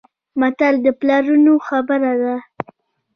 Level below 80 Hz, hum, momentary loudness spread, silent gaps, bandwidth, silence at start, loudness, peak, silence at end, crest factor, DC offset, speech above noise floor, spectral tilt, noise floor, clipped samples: -62 dBFS; none; 16 LU; none; 6.4 kHz; 0.35 s; -16 LUFS; -2 dBFS; 0.75 s; 14 dB; under 0.1%; 35 dB; -6.5 dB/octave; -50 dBFS; under 0.1%